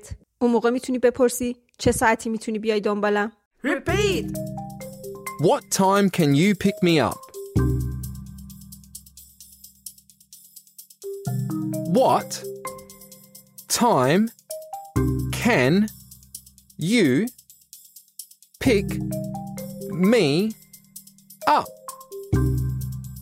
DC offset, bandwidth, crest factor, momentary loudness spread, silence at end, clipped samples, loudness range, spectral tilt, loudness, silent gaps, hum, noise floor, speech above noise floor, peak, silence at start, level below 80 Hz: under 0.1%; 16 kHz; 18 dB; 22 LU; 0 s; under 0.1%; 8 LU; -5.5 dB/octave; -22 LUFS; 3.46-3.51 s; none; -51 dBFS; 30 dB; -4 dBFS; 0.05 s; -40 dBFS